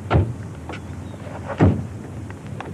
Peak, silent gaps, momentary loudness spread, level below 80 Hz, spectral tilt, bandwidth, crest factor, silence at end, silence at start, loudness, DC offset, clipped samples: -2 dBFS; none; 15 LU; -40 dBFS; -8 dB/octave; 11 kHz; 22 dB; 0 s; 0 s; -25 LUFS; under 0.1%; under 0.1%